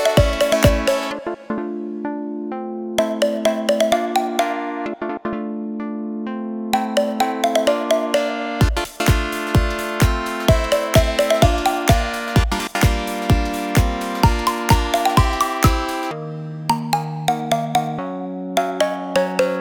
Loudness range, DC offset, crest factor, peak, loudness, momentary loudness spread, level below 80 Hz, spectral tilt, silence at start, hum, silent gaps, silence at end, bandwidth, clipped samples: 4 LU; under 0.1%; 18 dB; 0 dBFS; -20 LUFS; 10 LU; -28 dBFS; -5 dB/octave; 0 s; none; none; 0 s; over 20 kHz; under 0.1%